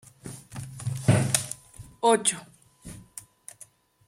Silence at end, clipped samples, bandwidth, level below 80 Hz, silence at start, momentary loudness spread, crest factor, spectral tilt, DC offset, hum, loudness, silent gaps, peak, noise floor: 0.85 s; under 0.1%; 16.5 kHz; -56 dBFS; 0.25 s; 23 LU; 24 dB; -4 dB/octave; under 0.1%; none; -25 LUFS; none; -4 dBFS; -54 dBFS